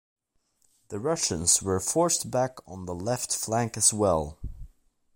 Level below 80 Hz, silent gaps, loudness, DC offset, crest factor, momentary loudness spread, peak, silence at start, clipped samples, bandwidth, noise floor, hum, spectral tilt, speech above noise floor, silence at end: -48 dBFS; none; -25 LUFS; under 0.1%; 22 dB; 16 LU; -6 dBFS; 0.9 s; under 0.1%; 16.5 kHz; -70 dBFS; none; -3.5 dB/octave; 44 dB; 0.5 s